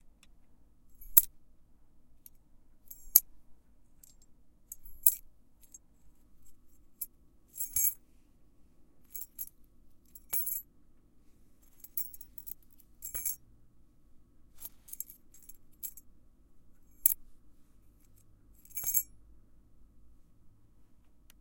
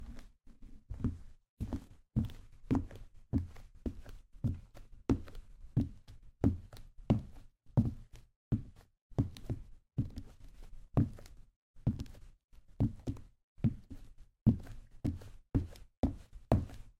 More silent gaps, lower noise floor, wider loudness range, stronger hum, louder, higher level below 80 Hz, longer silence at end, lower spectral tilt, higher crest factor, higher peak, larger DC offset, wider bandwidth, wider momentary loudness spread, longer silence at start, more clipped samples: second, none vs 1.49-1.57 s, 8.36-8.51 s, 9.02-9.10 s, 11.56-11.74 s, 12.44-12.48 s, 13.44-13.56 s, 14.41-14.46 s, 15.97-16.03 s; first, -61 dBFS vs -54 dBFS; first, 12 LU vs 3 LU; neither; first, -31 LUFS vs -38 LUFS; second, -62 dBFS vs -48 dBFS; first, 0.45 s vs 0.1 s; second, 0.5 dB/octave vs -9.5 dB/octave; first, 38 dB vs 26 dB; first, 0 dBFS vs -12 dBFS; neither; first, 17 kHz vs 11.5 kHz; first, 25 LU vs 21 LU; about the same, 0.05 s vs 0 s; neither